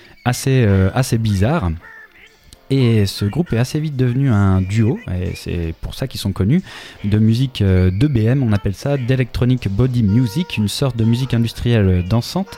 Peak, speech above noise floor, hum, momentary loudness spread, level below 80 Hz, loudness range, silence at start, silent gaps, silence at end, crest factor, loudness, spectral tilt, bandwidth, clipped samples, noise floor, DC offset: -2 dBFS; 29 dB; none; 9 LU; -36 dBFS; 2 LU; 0.25 s; none; 0 s; 16 dB; -17 LUFS; -7 dB/octave; 15.5 kHz; under 0.1%; -45 dBFS; under 0.1%